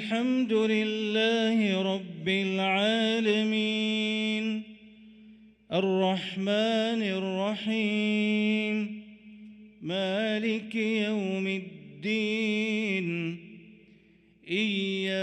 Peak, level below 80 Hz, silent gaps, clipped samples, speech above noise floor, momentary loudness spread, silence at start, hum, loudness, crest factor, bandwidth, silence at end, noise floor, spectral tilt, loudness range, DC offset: -14 dBFS; -72 dBFS; none; under 0.1%; 32 dB; 8 LU; 0 s; none; -28 LUFS; 14 dB; 9 kHz; 0 s; -60 dBFS; -5.5 dB/octave; 4 LU; under 0.1%